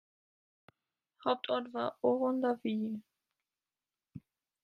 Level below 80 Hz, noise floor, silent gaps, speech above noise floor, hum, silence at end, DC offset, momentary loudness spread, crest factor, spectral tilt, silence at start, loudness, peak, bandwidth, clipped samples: -82 dBFS; under -90 dBFS; none; over 57 dB; none; 0.45 s; under 0.1%; 23 LU; 22 dB; -7.5 dB/octave; 1.25 s; -34 LUFS; -16 dBFS; 5.4 kHz; under 0.1%